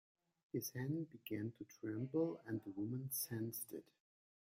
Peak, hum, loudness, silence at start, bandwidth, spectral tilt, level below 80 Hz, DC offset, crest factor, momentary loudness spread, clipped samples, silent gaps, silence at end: -28 dBFS; none; -45 LUFS; 0.55 s; 16 kHz; -5.5 dB/octave; -82 dBFS; under 0.1%; 18 dB; 8 LU; under 0.1%; none; 0.75 s